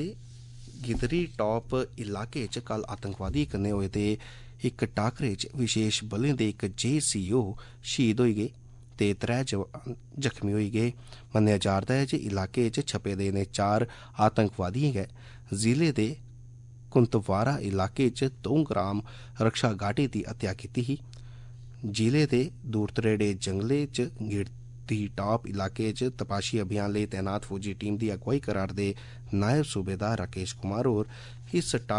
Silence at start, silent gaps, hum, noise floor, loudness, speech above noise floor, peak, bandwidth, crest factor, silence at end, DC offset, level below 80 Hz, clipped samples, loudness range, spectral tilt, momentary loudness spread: 0 s; none; none; -48 dBFS; -29 LUFS; 19 dB; -10 dBFS; 11 kHz; 18 dB; 0 s; under 0.1%; -50 dBFS; under 0.1%; 3 LU; -5.5 dB/octave; 10 LU